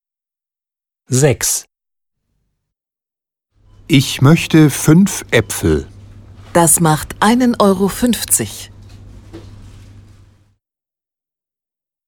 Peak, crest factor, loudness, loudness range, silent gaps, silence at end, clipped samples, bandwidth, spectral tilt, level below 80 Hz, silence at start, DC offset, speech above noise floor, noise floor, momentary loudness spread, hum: 0 dBFS; 16 dB; -13 LUFS; 8 LU; none; 2.4 s; under 0.1%; 19.5 kHz; -4.5 dB/octave; -40 dBFS; 1.1 s; under 0.1%; 77 dB; -89 dBFS; 8 LU; none